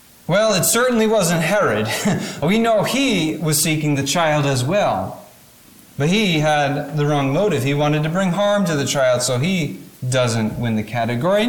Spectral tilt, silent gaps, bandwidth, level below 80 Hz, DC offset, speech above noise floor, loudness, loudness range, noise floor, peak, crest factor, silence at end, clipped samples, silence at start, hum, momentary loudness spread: -4.5 dB/octave; none; 19 kHz; -50 dBFS; 0.2%; 29 dB; -18 LUFS; 2 LU; -46 dBFS; -6 dBFS; 12 dB; 0 s; under 0.1%; 0.3 s; none; 6 LU